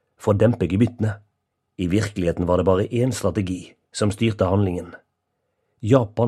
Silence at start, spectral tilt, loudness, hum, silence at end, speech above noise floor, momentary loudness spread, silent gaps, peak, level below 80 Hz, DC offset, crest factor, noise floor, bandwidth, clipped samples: 0.2 s; -7 dB/octave; -22 LUFS; none; 0 s; 55 dB; 13 LU; none; 0 dBFS; -46 dBFS; under 0.1%; 20 dB; -75 dBFS; 13 kHz; under 0.1%